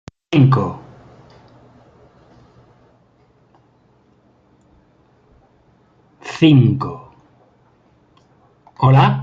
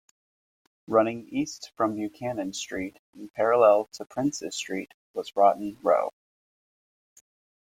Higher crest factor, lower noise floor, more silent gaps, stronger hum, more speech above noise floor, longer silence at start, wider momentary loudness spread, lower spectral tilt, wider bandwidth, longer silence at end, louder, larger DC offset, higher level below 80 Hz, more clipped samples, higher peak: about the same, 18 dB vs 22 dB; second, -55 dBFS vs under -90 dBFS; second, none vs 2.99-3.13 s, 4.94-5.14 s; neither; second, 43 dB vs over 64 dB; second, 0.3 s vs 0.9 s; first, 24 LU vs 15 LU; first, -8.5 dB/octave vs -4.5 dB/octave; second, 7.2 kHz vs 15.5 kHz; second, 0 s vs 1.55 s; first, -15 LUFS vs -26 LUFS; neither; first, -54 dBFS vs -68 dBFS; neither; first, -2 dBFS vs -6 dBFS